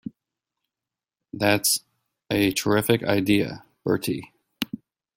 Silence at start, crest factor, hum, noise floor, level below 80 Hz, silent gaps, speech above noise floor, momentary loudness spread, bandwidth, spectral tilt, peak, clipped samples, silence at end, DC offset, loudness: 0.05 s; 22 dB; none; -89 dBFS; -58 dBFS; none; 67 dB; 12 LU; 16.5 kHz; -4 dB/octave; -4 dBFS; under 0.1%; 0.4 s; under 0.1%; -24 LUFS